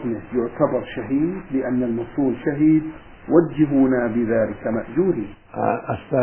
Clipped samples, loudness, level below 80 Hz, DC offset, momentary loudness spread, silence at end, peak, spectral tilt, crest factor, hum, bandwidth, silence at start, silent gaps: under 0.1%; -21 LUFS; -48 dBFS; 0.2%; 8 LU; 0 s; -2 dBFS; -12.5 dB/octave; 18 dB; none; 3.3 kHz; 0 s; none